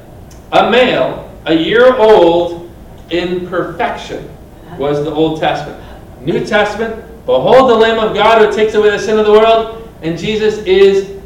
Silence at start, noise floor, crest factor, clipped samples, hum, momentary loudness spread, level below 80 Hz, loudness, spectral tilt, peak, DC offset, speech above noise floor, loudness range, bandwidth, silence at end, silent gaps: 0.1 s; -34 dBFS; 12 dB; 1%; none; 16 LU; -38 dBFS; -11 LUFS; -5.5 dB/octave; 0 dBFS; under 0.1%; 23 dB; 8 LU; 11 kHz; 0 s; none